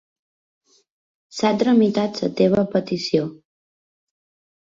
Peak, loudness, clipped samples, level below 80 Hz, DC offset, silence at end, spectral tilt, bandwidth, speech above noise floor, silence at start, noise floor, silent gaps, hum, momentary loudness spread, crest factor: -4 dBFS; -20 LUFS; under 0.1%; -60 dBFS; under 0.1%; 1.35 s; -6.5 dB/octave; 7.6 kHz; over 71 dB; 1.35 s; under -90 dBFS; none; none; 7 LU; 18 dB